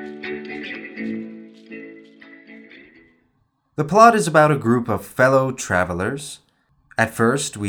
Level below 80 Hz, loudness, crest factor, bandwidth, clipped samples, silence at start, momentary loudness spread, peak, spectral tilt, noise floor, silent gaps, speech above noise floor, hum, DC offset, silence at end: -60 dBFS; -19 LUFS; 20 dB; 19.5 kHz; under 0.1%; 0 s; 24 LU; 0 dBFS; -5.5 dB/octave; -66 dBFS; none; 49 dB; none; under 0.1%; 0 s